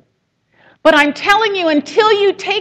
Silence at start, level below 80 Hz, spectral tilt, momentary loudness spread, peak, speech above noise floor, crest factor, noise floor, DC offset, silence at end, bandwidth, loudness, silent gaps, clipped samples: 0.85 s; -52 dBFS; -3 dB/octave; 4 LU; 0 dBFS; 51 dB; 14 dB; -64 dBFS; under 0.1%; 0 s; 15 kHz; -12 LUFS; none; under 0.1%